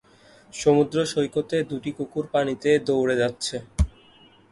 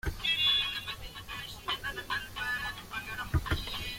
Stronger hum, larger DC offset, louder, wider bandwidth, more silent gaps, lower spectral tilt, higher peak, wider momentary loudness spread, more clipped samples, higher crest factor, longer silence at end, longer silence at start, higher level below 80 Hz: neither; neither; first, -24 LUFS vs -32 LUFS; second, 11.5 kHz vs 16.5 kHz; neither; first, -5.5 dB/octave vs -3 dB/octave; first, -6 dBFS vs -16 dBFS; second, 9 LU vs 15 LU; neither; about the same, 18 dB vs 18 dB; first, 0.65 s vs 0 s; first, 0.55 s vs 0.05 s; first, -36 dBFS vs -44 dBFS